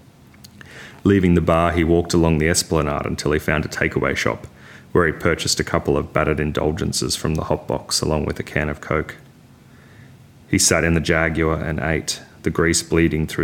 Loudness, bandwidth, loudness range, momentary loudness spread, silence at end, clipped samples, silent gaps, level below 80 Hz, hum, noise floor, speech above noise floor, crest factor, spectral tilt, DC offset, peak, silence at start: -19 LUFS; 17 kHz; 4 LU; 8 LU; 0 s; under 0.1%; none; -36 dBFS; none; -47 dBFS; 28 dB; 20 dB; -4.5 dB/octave; under 0.1%; 0 dBFS; 0.6 s